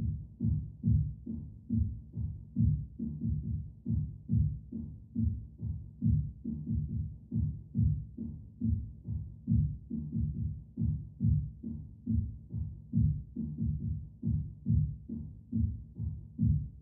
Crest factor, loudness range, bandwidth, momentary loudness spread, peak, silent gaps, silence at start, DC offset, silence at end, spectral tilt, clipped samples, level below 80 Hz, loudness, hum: 16 dB; 1 LU; 0.9 kHz; 10 LU; -18 dBFS; none; 0 s; under 0.1%; 0 s; -18 dB/octave; under 0.1%; -42 dBFS; -35 LUFS; none